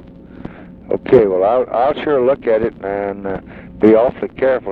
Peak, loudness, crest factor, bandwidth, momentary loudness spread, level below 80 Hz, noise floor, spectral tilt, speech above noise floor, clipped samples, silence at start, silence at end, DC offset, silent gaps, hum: 0 dBFS; -15 LUFS; 16 dB; 4.8 kHz; 22 LU; -44 dBFS; -34 dBFS; -9.5 dB/octave; 19 dB; under 0.1%; 0.1 s; 0 s; under 0.1%; none; none